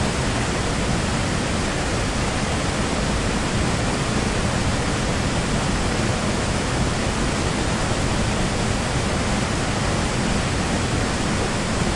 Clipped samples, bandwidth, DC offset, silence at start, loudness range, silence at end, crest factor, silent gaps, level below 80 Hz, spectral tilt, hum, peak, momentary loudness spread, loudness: under 0.1%; 11.5 kHz; under 0.1%; 0 s; 0 LU; 0 s; 14 dB; none; -30 dBFS; -4.5 dB/octave; none; -8 dBFS; 1 LU; -22 LUFS